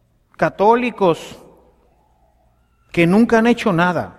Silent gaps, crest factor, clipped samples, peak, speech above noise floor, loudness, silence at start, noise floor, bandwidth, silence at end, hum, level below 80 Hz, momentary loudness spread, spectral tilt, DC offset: none; 18 dB; under 0.1%; 0 dBFS; 43 dB; -16 LUFS; 0.4 s; -58 dBFS; 13.5 kHz; 0.05 s; none; -50 dBFS; 10 LU; -6.5 dB/octave; under 0.1%